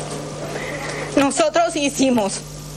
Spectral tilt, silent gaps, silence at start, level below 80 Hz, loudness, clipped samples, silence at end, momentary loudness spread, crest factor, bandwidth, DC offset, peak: -4 dB/octave; none; 0 s; -46 dBFS; -20 LUFS; under 0.1%; 0 s; 11 LU; 18 dB; 14 kHz; under 0.1%; -4 dBFS